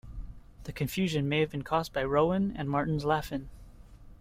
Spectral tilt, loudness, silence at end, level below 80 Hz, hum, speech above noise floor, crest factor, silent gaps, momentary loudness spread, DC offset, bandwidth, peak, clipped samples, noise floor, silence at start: -6.5 dB/octave; -30 LUFS; 0.05 s; -48 dBFS; none; 21 dB; 18 dB; none; 20 LU; under 0.1%; 16 kHz; -12 dBFS; under 0.1%; -50 dBFS; 0.05 s